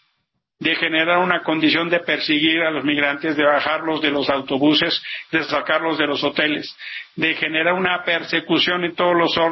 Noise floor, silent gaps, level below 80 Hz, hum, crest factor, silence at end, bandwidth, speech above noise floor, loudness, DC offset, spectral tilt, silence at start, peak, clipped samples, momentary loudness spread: -72 dBFS; none; -60 dBFS; none; 16 dB; 0 s; 6 kHz; 53 dB; -18 LUFS; under 0.1%; -5.5 dB/octave; 0.6 s; -4 dBFS; under 0.1%; 5 LU